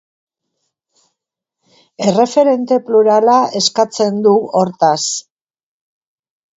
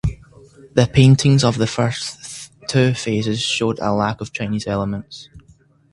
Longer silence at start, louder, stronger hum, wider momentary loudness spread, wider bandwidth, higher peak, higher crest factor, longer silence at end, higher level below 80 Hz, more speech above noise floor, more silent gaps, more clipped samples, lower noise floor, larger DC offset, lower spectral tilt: first, 2 s vs 0.05 s; first, -13 LUFS vs -18 LUFS; neither; second, 6 LU vs 17 LU; second, 8 kHz vs 11.5 kHz; about the same, 0 dBFS vs 0 dBFS; about the same, 16 dB vs 18 dB; first, 1.35 s vs 0.55 s; second, -66 dBFS vs -40 dBFS; first, 67 dB vs 35 dB; neither; neither; first, -80 dBFS vs -52 dBFS; neither; second, -4 dB/octave vs -5.5 dB/octave